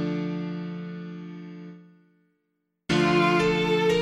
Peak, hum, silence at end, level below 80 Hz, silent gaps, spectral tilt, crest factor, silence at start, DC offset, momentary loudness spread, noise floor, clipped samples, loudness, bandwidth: -10 dBFS; none; 0 s; -54 dBFS; none; -6 dB/octave; 16 dB; 0 s; under 0.1%; 21 LU; -77 dBFS; under 0.1%; -24 LUFS; 12.5 kHz